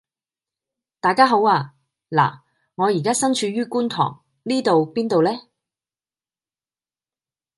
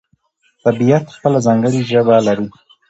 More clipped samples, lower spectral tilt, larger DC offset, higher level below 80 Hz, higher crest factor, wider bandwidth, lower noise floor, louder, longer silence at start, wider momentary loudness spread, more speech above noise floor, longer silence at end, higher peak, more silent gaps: neither; second, -4.5 dB/octave vs -7 dB/octave; neither; second, -70 dBFS vs -56 dBFS; first, 20 dB vs 14 dB; first, 12 kHz vs 8.2 kHz; first, under -90 dBFS vs -60 dBFS; second, -20 LUFS vs -14 LUFS; first, 1.05 s vs 0.65 s; about the same, 9 LU vs 7 LU; first, over 71 dB vs 47 dB; first, 2.15 s vs 0.4 s; about the same, -2 dBFS vs 0 dBFS; neither